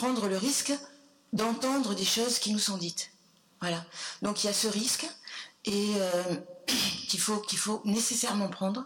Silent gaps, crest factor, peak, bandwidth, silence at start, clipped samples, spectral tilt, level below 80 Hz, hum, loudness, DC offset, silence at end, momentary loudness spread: none; 14 dB; -18 dBFS; 19 kHz; 0 s; under 0.1%; -2.5 dB/octave; -72 dBFS; none; -30 LUFS; under 0.1%; 0 s; 10 LU